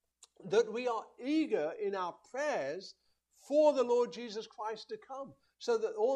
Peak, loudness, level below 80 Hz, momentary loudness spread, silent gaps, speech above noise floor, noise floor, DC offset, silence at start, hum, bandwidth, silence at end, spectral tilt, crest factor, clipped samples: -16 dBFS; -34 LUFS; -86 dBFS; 17 LU; none; 19 dB; -53 dBFS; under 0.1%; 0.4 s; none; 9.8 kHz; 0 s; -4.5 dB/octave; 18 dB; under 0.1%